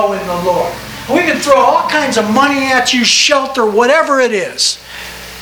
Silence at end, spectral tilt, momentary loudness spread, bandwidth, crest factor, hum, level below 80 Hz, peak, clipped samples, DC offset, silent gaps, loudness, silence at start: 0 s; -2.5 dB/octave; 11 LU; over 20 kHz; 12 dB; none; -44 dBFS; 0 dBFS; 0.1%; under 0.1%; none; -11 LUFS; 0 s